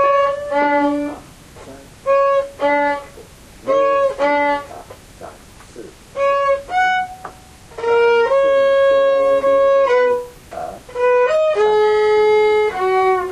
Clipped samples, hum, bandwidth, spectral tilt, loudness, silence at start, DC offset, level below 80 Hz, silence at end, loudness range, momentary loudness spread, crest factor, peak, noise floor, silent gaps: under 0.1%; none; 12.5 kHz; -4.5 dB/octave; -16 LUFS; 0 s; under 0.1%; -48 dBFS; 0 s; 6 LU; 16 LU; 12 dB; -6 dBFS; -40 dBFS; none